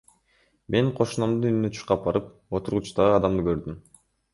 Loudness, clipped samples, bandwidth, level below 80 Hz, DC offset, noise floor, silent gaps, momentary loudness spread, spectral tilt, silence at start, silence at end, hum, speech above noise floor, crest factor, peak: -25 LUFS; under 0.1%; 11.5 kHz; -48 dBFS; under 0.1%; -66 dBFS; none; 10 LU; -7 dB/octave; 0.7 s; 0.55 s; none; 42 dB; 20 dB; -6 dBFS